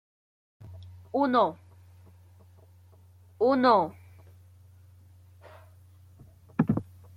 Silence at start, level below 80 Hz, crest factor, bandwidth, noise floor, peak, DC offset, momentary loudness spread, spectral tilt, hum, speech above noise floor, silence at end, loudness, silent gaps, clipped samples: 0.6 s; -64 dBFS; 20 dB; 13 kHz; -55 dBFS; -10 dBFS; under 0.1%; 26 LU; -8 dB/octave; none; 32 dB; 0.35 s; -26 LUFS; none; under 0.1%